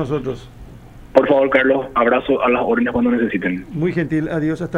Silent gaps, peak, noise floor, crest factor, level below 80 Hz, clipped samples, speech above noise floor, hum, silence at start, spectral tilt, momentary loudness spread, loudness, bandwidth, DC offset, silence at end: none; 0 dBFS; -39 dBFS; 18 dB; -44 dBFS; under 0.1%; 21 dB; none; 0 s; -8 dB/octave; 8 LU; -17 LUFS; 9.8 kHz; under 0.1%; 0 s